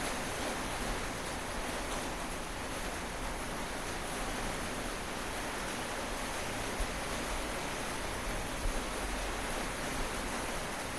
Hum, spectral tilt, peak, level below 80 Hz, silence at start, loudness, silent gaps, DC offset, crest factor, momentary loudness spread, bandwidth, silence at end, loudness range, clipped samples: none; -3 dB/octave; -22 dBFS; -44 dBFS; 0 s; -37 LUFS; none; 0.2%; 16 dB; 2 LU; 15 kHz; 0 s; 1 LU; under 0.1%